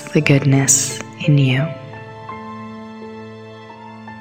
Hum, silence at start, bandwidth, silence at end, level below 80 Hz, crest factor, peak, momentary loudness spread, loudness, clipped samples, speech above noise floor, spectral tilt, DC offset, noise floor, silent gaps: none; 0 s; 16.5 kHz; 0 s; -56 dBFS; 18 dB; 0 dBFS; 23 LU; -15 LUFS; under 0.1%; 22 dB; -4.5 dB/octave; under 0.1%; -36 dBFS; none